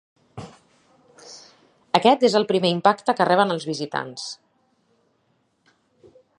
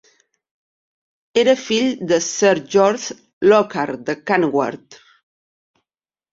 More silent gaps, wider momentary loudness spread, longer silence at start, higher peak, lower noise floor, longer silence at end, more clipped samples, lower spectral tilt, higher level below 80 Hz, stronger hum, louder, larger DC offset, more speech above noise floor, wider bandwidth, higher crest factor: second, none vs 3.33-3.41 s; first, 24 LU vs 11 LU; second, 0.35 s vs 1.35 s; about the same, 0 dBFS vs -2 dBFS; second, -67 dBFS vs under -90 dBFS; first, 2.05 s vs 1.4 s; neither; about the same, -5 dB/octave vs -4 dB/octave; about the same, -68 dBFS vs -64 dBFS; neither; about the same, -20 LUFS vs -18 LUFS; neither; second, 47 dB vs over 73 dB; first, 11 kHz vs 7.8 kHz; first, 24 dB vs 18 dB